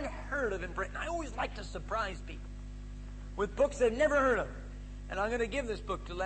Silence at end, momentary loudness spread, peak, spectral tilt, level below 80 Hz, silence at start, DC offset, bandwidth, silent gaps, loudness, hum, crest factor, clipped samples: 0 s; 18 LU; -18 dBFS; -5 dB/octave; -44 dBFS; 0 s; under 0.1%; 8.8 kHz; none; -34 LUFS; 50 Hz at -45 dBFS; 16 dB; under 0.1%